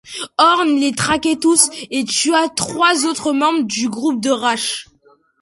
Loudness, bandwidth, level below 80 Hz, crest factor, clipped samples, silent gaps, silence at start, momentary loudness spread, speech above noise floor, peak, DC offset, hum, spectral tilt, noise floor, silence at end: -16 LUFS; 12 kHz; -54 dBFS; 16 dB; under 0.1%; none; 0.05 s; 7 LU; 38 dB; 0 dBFS; under 0.1%; none; -2 dB/octave; -54 dBFS; 0.6 s